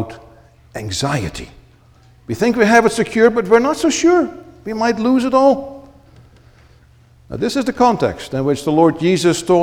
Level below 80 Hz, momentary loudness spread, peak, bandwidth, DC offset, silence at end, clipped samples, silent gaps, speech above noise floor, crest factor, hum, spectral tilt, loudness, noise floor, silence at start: -46 dBFS; 16 LU; 0 dBFS; 17 kHz; under 0.1%; 0 s; under 0.1%; none; 33 dB; 16 dB; none; -5 dB/octave; -15 LUFS; -48 dBFS; 0 s